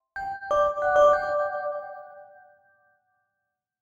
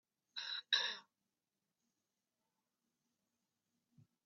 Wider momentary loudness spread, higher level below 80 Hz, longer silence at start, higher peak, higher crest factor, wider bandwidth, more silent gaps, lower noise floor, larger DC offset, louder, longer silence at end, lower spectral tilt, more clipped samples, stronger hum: about the same, 17 LU vs 15 LU; first, -58 dBFS vs under -90 dBFS; second, 0.15 s vs 0.35 s; first, -10 dBFS vs -18 dBFS; second, 18 dB vs 30 dB; about the same, 7.4 kHz vs 7.2 kHz; neither; second, -82 dBFS vs under -90 dBFS; neither; first, -24 LUFS vs -39 LUFS; second, 1.6 s vs 3.25 s; first, -3.5 dB/octave vs 4.5 dB/octave; neither; neither